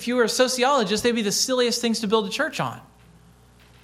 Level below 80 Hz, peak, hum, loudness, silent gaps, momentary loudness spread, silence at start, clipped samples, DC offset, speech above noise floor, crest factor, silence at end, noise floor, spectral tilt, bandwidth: -58 dBFS; -4 dBFS; none; -22 LUFS; none; 7 LU; 0 s; under 0.1%; under 0.1%; 30 dB; 18 dB; 1 s; -52 dBFS; -3 dB/octave; 16 kHz